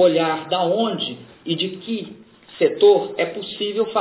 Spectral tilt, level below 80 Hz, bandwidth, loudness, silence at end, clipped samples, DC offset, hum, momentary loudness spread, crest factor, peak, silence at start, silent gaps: -9.5 dB/octave; -68 dBFS; 4 kHz; -20 LUFS; 0 s; under 0.1%; under 0.1%; none; 13 LU; 16 dB; -4 dBFS; 0 s; none